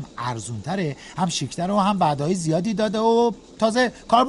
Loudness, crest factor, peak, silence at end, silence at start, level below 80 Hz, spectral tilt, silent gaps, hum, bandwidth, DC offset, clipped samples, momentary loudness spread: -22 LUFS; 18 dB; -4 dBFS; 0 s; 0 s; -54 dBFS; -5 dB/octave; none; none; 11.5 kHz; under 0.1%; under 0.1%; 9 LU